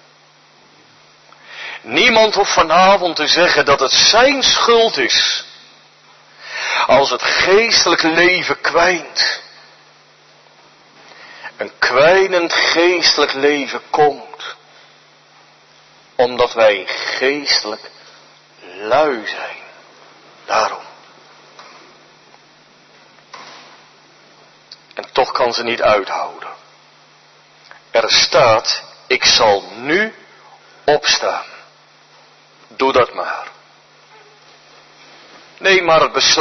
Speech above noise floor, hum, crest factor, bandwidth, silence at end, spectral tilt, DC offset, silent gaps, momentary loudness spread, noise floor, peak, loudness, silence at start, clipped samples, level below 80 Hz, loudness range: 35 dB; none; 18 dB; 6.4 kHz; 0 s; -1.5 dB/octave; under 0.1%; none; 19 LU; -49 dBFS; 0 dBFS; -13 LUFS; 1.5 s; under 0.1%; -52 dBFS; 10 LU